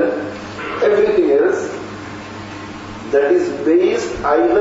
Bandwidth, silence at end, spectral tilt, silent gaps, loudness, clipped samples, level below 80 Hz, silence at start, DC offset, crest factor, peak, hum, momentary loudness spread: 8 kHz; 0 s; -5.5 dB/octave; none; -16 LUFS; under 0.1%; -46 dBFS; 0 s; under 0.1%; 14 dB; -2 dBFS; none; 16 LU